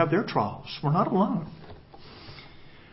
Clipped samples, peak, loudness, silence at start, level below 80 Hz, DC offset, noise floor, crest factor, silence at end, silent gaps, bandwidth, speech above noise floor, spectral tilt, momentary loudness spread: under 0.1%; -8 dBFS; -27 LUFS; 0 s; -58 dBFS; under 0.1%; -48 dBFS; 20 dB; 0.1 s; none; 5.8 kHz; 22 dB; -11 dB/octave; 23 LU